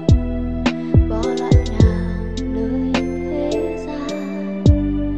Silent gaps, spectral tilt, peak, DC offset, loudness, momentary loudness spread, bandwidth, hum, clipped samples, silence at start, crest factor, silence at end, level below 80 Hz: none; -7.5 dB/octave; -2 dBFS; 0.9%; -19 LUFS; 9 LU; 8.4 kHz; none; under 0.1%; 0 s; 16 dB; 0 s; -24 dBFS